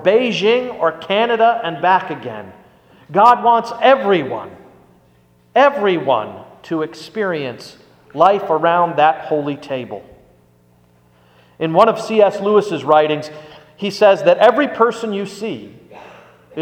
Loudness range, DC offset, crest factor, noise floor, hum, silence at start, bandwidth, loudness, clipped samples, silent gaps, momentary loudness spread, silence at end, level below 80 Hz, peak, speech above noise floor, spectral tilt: 5 LU; under 0.1%; 16 dB; -53 dBFS; none; 0 s; 14.5 kHz; -15 LUFS; under 0.1%; none; 16 LU; 0 s; -62 dBFS; 0 dBFS; 38 dB; -5.5 dB/octave